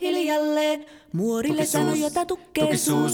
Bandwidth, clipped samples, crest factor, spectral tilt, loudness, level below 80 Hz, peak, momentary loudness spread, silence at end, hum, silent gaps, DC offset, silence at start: 19.5 kHz; under 0.1%; 16 dB; -4.5 dB/octave; -24 LUFS; -58 dBFS; -8 dBFS; 6 LU; 0 s; none; none; under 0.1%; 0 s